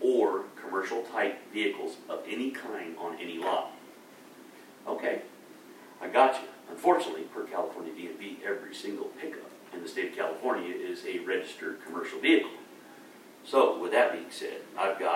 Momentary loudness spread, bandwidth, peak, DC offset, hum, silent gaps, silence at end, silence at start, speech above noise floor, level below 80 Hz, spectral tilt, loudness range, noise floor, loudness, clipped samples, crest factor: 24 LU; 16 kHz; -8 dBFS; under 0.1%; none; none; 0 s; 0 s; 21 dB; under -90 dBFS; -3.5 dB/octave; 7 LU; -52 dBFS; -31 LUFS; under 0.1%; 22 dB